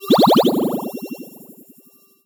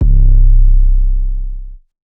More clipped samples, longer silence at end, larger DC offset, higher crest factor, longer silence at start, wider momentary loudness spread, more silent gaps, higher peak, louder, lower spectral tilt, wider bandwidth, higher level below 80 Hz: second, under 0.1% vs 0.6%; first, 0.95 s vs 0.35 s; neither; first, 16 dB vs 8 dB; about the same, 0 s vs 0 s; first, 21 LU vs 15 LU; neither; second, -4 dBFS vs 0 dBFS; about the same, -16 LUFS vs -15 LUFS; second, -6 dB/octave vs -14 dB/octave; first, over 20 kHz vs 0.6 kHz; second, -68 dBFS vs -8 dBFS